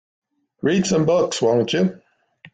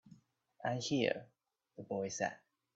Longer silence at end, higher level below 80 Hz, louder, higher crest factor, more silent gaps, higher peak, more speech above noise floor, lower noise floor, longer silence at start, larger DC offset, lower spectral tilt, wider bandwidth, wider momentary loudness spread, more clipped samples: second, 0.05 s vs 0.4 s; first, -58 dBFS vs -80 dBFS; first, -19 LUFS vs -39 LUFS; second, 14 dB vs 22 dB; neither; first, -6 dBFS vs -18 dBFS; about the same, 32 dB vs 29 dB; second, -51 dBFS vs -67 dBFS; first, 0.65 s vs 0.05 s; neither; about the same, -5 dB/octave vs -4.5 dB/octave; first, 9.2 kHz vs 8.2 kHz; second, 5 LU vs 21 LU; neither